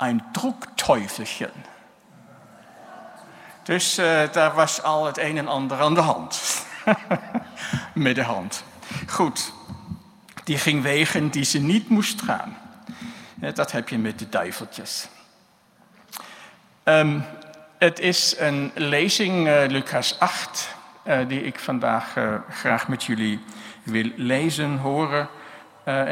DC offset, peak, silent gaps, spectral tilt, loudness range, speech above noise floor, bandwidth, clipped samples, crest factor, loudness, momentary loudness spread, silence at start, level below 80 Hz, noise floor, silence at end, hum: under 0.1%; 0 dBFS; none; -4 dB/octave; 8 LU; 35 dB; 16 kHz; under 0.1%; 24 dB; -23 LUFS; 19 LU; 0 s; -64 dBFS; -58 dBFS; 0 s; none